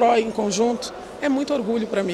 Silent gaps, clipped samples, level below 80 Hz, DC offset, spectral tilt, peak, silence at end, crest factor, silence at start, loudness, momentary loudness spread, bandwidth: none; under 0.1%; -56 dBFS; under 0.1%; -4.5 dB/octave; -6 dBFS; 0 s; 14 dB; 0 s; -23 LUFS; 7 LU; 12.5 kHz